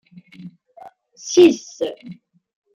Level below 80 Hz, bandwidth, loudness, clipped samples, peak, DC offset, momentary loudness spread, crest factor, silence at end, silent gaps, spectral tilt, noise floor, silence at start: -66 dBFS; 7.6 kHz; -17 LUFS; under 0.1%; -2 dBFS; under 0.1%; 25 LU; 18 dB; 0.6 s; none; -4 dB/octave; -45 dBFS; 0.45 s